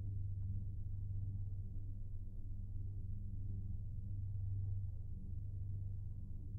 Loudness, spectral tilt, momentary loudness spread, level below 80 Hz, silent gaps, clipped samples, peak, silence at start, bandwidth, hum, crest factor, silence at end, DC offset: -47 LUFS; -17 dB/octave; 6 LU; -48 dBFS; none; under 0.1%; -32 dBFS; 0 s; 0.9 kHz; none; 10 dB; 0 s; under 0.1%